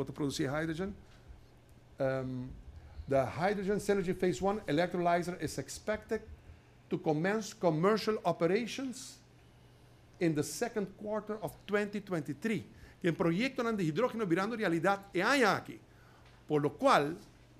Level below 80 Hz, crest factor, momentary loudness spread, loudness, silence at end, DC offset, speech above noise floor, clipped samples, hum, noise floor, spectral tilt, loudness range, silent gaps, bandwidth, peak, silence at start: -60 dBFS; 22 dB; 11 LU; -33 LUFS; 0.3 s; under 0.1%; 27 dB; under 0.1%; none; -60 dBFS; -5.5 dB/octave; 5 LU; none; 15 kHz; -12 dBFS; 0 s